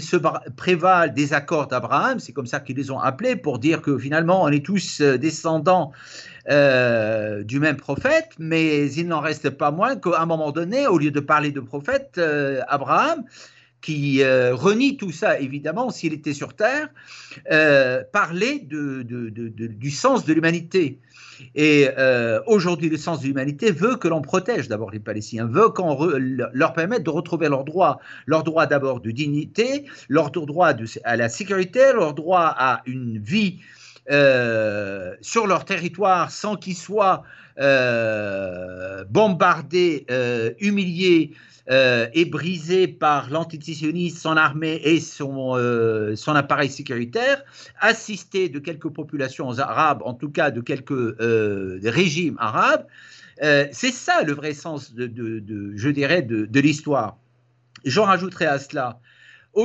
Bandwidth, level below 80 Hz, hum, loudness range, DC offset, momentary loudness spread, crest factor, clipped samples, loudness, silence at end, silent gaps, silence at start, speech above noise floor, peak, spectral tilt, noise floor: 8.2 kHz; -66 dBFS; none; 3 LU; under 0.1%; 12 LU; 18 dB; under 0.1%; -21 LUFS; 0 s; none; 0 s; 40 dB; -4 dBFS; -5.5 dB/octave; -61 dBFS